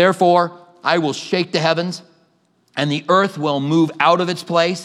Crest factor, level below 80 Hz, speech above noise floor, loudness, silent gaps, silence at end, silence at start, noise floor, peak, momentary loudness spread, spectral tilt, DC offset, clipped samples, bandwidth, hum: 18 dB; -74 dBFS; 44 dB; -18 LUFS; none; 0 s; 0 s; -61 dBFS; 0 dBFS; 9 LU; -5.5 dB/octave; under 0.1%; under 0.1%; 13 kHz; none